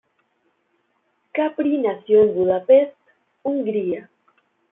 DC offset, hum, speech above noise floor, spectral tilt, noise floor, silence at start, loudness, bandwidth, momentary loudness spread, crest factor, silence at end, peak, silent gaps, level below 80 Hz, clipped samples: under 0.1%; none; 50 dB; -10.5 dB/octave; -68 dBFS; 1.35 s; -20 LUFS; 3.8 kHz; 13 LU; 16 dB; 0.7 s; -4 dBFS; none; -66 dBFS; under 0.1%